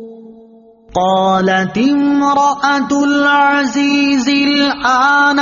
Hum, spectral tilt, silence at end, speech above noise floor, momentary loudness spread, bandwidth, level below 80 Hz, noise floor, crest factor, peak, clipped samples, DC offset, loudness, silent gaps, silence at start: none; -2.5 dB/octave; 0 s; 30 dB; 4 LU; 7.4 kHz; -50 dBFS; -42 dBFS; 12 dB; -2 dBFS; under 0.1%; under 0.1%; -12 LUFS; none; 0 s